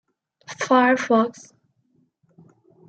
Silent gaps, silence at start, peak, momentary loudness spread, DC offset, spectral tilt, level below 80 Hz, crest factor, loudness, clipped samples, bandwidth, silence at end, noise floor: none; 0.5 s; -4 dBFS; 14 LU; under 0.1%; -4.5 dB/octave; -78 dBFS; 20 dB; -20 LUFS; under 0.1%; 8.8 kHz; 1.6 s; -66 dBFS